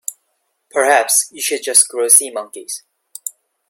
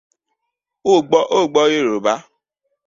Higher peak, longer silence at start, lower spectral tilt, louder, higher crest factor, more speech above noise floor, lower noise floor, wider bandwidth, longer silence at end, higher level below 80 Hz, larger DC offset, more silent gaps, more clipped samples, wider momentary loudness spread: about the same, 0 dBFS vs -2 dBFS; second, 0.1 s vs 0.85 s; second, 1.5 dB/octave vs -4 dB/octave; first, -12 LUFS vs -16 LUFS; about the same, 18 dB vs 16 dB; second, 53 dB vs 63 dB; second, -68 dBFS vs -79 dBFS; first, 17 kHz vs 7.6 kHz; second, 0.4 s vs 0.65 s; second, -70 dBFS vs -62 dBFS; neither; neither; neither; first, 19 LU vs 8 LU